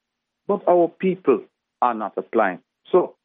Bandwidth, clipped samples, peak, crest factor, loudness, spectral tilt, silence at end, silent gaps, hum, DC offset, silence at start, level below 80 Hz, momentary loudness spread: 3.9 kHz; under 0.1%; -4 dBFS; 18 dB; -22 LUFS; -11 dB/octave; 0.15 s; none; none; under 0.1%; 0.5 s; -82 dBFS; 9 LU